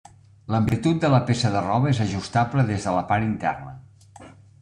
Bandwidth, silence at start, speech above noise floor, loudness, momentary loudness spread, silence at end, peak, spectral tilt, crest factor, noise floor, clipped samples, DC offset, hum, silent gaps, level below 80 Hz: 10.5 kHz; 0.5 s; 25 dB; -22 LUFS; 7 LU; 0.3 s; -6 dBFS; -6.5 dB/octave; 18 dB; -47 dBFS; under 0.1%; under 0.1%; none; none; -50 dBFS